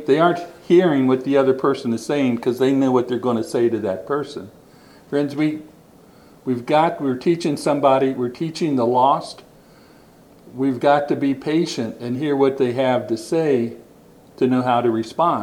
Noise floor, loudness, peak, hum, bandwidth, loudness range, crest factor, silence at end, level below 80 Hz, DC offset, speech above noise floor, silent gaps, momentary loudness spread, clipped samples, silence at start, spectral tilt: -48 dBFS; -20 LUFS; -2 dBFS; none; 13.5 kHz; 5 LU; 16 dB; 0 s; -64 dBFS; under 0.1%; 29 dB; none; 9 LU; under 0.1%; 0 s; -6.5 dB/octave